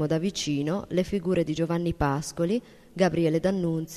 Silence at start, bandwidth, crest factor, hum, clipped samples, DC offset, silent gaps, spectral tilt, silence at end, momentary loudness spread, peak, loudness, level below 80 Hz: 0 s; 13.5 kHz; 18 dB; none; under 0.1%; under 0.1%; none; -6 dB/octave; 0 s; 4 LU; -8 dBFS; -27 LUFS; -48 dBFS